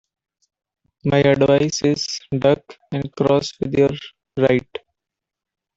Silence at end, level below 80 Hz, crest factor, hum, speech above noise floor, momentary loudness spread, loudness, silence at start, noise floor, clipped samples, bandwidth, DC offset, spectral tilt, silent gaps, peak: 1.15 s; -52 dBFS; 18 dB; none; 67 dB; 14 LU; -19 LUFS; 1.05 s; -85 dBFS; under 0.1%; 7.8 kHz; under 0.1%; -5.5 dB/octave; none; -2 dBFS